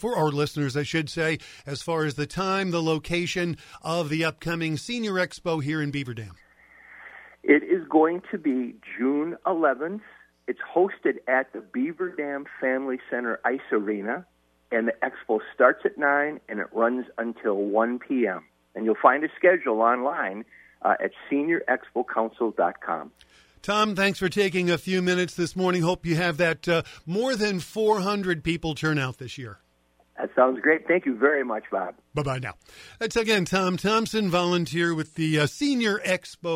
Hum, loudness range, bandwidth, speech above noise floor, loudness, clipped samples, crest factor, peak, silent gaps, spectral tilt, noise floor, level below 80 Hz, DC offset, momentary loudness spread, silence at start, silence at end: none; 4 LU; 16 kHz; 39 dB; -25 LUFS; under 0.1%; 22 dB; -2 dBFS; none; -5.5 dB/octave; -64 dBFS; -56 dBFS; under 0.1%; 11 LU; 0 s; 0 s